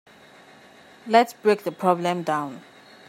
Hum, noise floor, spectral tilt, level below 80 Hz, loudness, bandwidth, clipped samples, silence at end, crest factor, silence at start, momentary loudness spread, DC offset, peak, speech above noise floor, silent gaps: none; -50 dBFS; -5.5 dB/octave; -78 dBFS; -22 LUFS; 16 kHz; under 0.1%; 0.5 s; 22 dB; 1.05 s; 17 LU; under 0.1%; -2 dBFS; 28 dB; none